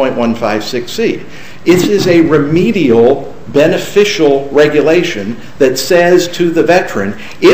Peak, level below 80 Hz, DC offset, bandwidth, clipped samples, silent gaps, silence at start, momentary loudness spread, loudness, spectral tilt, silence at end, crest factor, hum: 0 dBFS; -42 dBFS; 5%; 16 kHz; 0.5%; none; 0 s; 9 LU; -11 LUFS; -5 dB/octave; 0 s; 10 dB; none